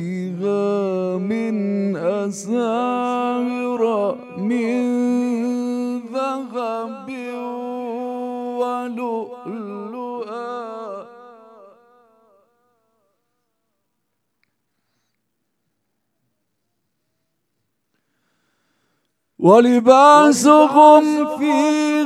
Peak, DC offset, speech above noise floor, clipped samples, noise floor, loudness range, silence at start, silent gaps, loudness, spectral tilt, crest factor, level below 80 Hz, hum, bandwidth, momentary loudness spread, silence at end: 0 dBFS; under 0.1%; 62 dB; under 0.1%; -75 dBFS; 19 LU; 0 s; none; -17 LUFS; -5.5 dB/octave; 20 dB; -78 dBFS; none; 13.5 kHz; 19 LU; 0 s